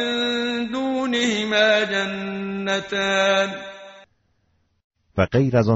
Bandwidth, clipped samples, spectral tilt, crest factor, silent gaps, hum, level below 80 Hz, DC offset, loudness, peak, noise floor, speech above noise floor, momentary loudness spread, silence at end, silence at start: 8 kHz; under 0.1%; -3.5 dB/octave; 18 dB; 4.84-4.90 s; none; -54 dBFS; under 0.1%; -21 LUFS; -4 dBFS; -66 dBFS; 46 dB; 10 LU; 0 s; 0 s